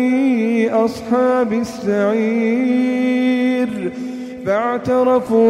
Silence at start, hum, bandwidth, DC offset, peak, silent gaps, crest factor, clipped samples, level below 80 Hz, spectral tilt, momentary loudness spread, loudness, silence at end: 0 s; none; 11.5 kHz; under 0.1%; -4 dBFS; none; 12 dB; under 0.1%; -56 dBFS; -6.5 dB/octave; 6 LU; -17 LUFS; 0 s